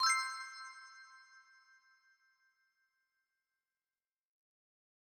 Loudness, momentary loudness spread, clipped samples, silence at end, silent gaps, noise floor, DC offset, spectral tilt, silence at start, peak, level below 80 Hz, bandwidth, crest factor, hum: -38 LUFS; 27 LU; under 0.1%; 3.7 s; none; under -90 dBFS; under 0.1%; 5.5 dB/octave; 0 s; -20 dBFS; under -90 dBFS; 19 kHz; 24 dB; none